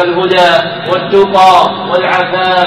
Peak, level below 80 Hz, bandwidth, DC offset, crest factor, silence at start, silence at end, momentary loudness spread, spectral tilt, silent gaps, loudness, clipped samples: 0 dBFS; -48 dBFS; 14.5 kHz; under 0.1%; 8 dB; 0 s; 0 s; 7 LU; -4.5 dB/octave; none; -9 LUFS; 0.5%